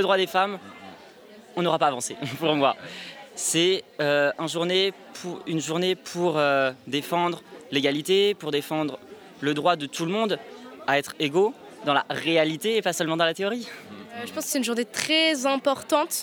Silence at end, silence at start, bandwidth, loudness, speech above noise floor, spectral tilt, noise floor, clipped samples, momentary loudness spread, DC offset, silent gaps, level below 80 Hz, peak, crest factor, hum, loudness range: 0 s; 0 s; over 20 kHz; -25 LUFS; 23 dB; -3.5 dB/octave; -48 dBFS; under 0.1%; 14 LU; under 0.1%; none; -76 dBFS; -4 dBFS; 20 dB; none; 2 LU